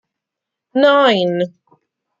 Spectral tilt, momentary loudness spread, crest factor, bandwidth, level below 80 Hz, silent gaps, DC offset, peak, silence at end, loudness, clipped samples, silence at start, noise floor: -6 dB/octave; 12 LU; 16 dB; 7.6 kHz; -68 dBFS; none; under 0.1%; -2 dBFS; 0.7 s; -15 LUFS; under 0.1%; 0.75 s; -82 dBFS